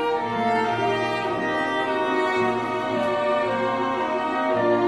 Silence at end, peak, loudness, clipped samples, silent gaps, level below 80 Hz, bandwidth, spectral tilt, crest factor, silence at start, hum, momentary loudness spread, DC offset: 0 s; -10 dBFS; -23 LUFS; under 0.1%; none; -62 dBFS; 12 kHz; -5.5 dB/octave; 12 dB; 0 s; none; 2 LU; 0.1%